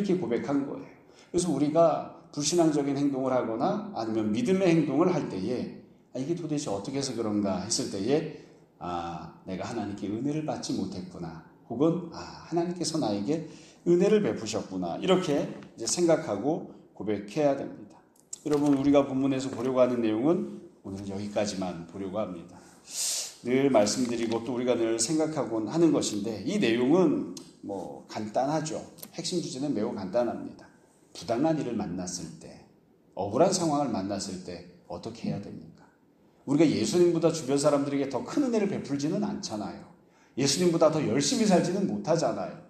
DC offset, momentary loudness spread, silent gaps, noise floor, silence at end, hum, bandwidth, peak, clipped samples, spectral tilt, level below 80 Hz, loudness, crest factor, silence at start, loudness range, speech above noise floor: under 0.1%; 16 LU; none; -62 dBFS; 0.05 s; none; 14.5 kHz; -8 dBFS; under 0.1%; -5 dB/octave; -66 dBFS; -28 LUFS; 20 dB; 0 s; 5 LU; 34 dB